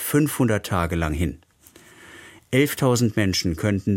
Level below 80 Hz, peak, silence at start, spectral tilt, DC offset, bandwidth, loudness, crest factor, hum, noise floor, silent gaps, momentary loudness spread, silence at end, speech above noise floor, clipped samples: -40 dBFS; -6 dBFS; 0 s; -5.5 dB/octave; under 0.1%; 17 kHz; -22 LUFS; 18 dB; none; -51 dBFS; none; 8 LU; 0 s; 30 dB; under 0.1%